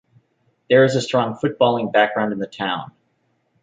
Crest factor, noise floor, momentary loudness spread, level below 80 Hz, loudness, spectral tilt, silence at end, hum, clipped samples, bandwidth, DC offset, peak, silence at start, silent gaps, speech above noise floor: 18 dB; -67 dBFS; 10 LU; -64 dBFS; -19 LUFS; -5.5 dB/octave; 0.75 s; none; under 0.1%; 9.2 kHz; under 0.1%; -2 dBFS; 0.7 s; none; 49 dB